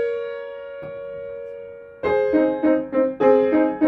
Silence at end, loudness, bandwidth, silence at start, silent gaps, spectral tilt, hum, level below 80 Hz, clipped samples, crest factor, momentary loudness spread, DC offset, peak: 0 s; -20 LUFS; 4.8 kHz; 0 s; none; -8.5 dB/octave; none; -58 dBFS; under 0.1%; 16 dB; 17 LU; under 0.1%; -4 dBFS